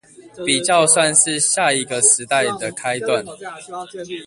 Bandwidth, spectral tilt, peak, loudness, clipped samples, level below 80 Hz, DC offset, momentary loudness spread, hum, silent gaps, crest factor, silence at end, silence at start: 11.5 kHz; -1.5 dB/octave; 0 dBFS; -16 LUFS; under 0.1%; -60 dBFS; under 0.1%; 19 LU; none; none; 18 dB; 0 s; 0.2 s